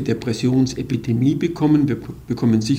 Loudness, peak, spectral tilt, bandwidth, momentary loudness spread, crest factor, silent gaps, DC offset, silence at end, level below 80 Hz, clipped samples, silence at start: -20 LUFS; -6 dBFS; -7 dB/octave; 15.5 kHz; 7 LU; 14 dB; none; under 0.1%; 0 s; -46 dBFS; under 0.1%; 0 s